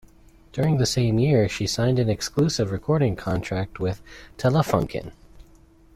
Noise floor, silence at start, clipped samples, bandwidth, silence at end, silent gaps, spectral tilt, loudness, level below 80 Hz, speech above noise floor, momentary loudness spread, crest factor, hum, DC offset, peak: -52 dBFS; 0.55 s; under 0.1%; 15.5 kHz; 0.55 s; none; -6 dB/octave; -23 LUFS; -46 dBFS; 30 dB; 11 LU; 18 dB; none; under 0.1%; -6 dBFS